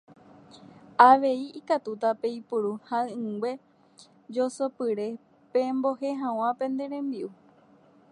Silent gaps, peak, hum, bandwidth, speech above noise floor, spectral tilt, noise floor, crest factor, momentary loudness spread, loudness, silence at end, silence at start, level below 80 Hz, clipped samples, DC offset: none; -2 dBFS; none; 11 kHz; 32 dB; -5.5 dB/octave; -58 dBFS; 26 dB; 15 LU; -27 LUFS; 0.8 s; 0.55 s; -82 dBFS; under 0.1%; under 0.1%